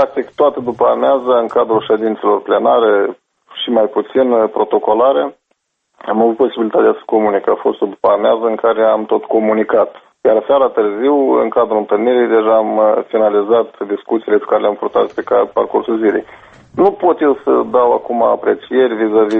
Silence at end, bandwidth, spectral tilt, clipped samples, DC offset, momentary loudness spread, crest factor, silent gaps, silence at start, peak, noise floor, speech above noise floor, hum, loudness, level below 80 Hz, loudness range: 0 s; 4.3 kHz; -7.5 dB/octave; under 0.1%; under 0.1%; 4 LU; 14 dB; none; 0 s; 0 dBFS; -66 dBFS; 53 dB; none; -14 LUFS; -56 dBFS; 2 LU